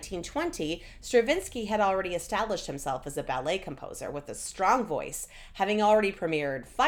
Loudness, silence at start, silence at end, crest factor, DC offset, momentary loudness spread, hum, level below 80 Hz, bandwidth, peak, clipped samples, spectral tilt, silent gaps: -29 LUFS; 0 s; 0 s; 18 dB; under 0.1%; 12 LU; none; -50 dBFS; 18.5 kHz; -10 dBFS; under 0.1%; -4 dB/octave; none